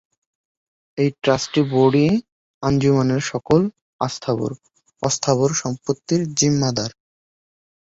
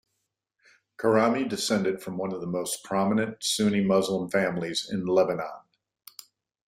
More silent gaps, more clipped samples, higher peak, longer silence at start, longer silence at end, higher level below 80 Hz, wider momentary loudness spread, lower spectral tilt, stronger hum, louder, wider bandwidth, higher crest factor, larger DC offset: first, 2.32-2.61 s, 3.81-3.99 s vs none; neither; first, -2 dBFS vs -8 dBFS; about the same, 0.95 s vs 1 s; second, 0.95 s vs 1.1 s; first, -52 dBFS vs -66 dBFS; about the same, 10 LU vs 10 LU; about the same, -5 dB/octave vs -4.5 dB/octave; neither; first, -20 LUFS vs -26 LUFS; second, 8 kHz vs 16 kHz; about the same, 18 dB vs 18 dB; neither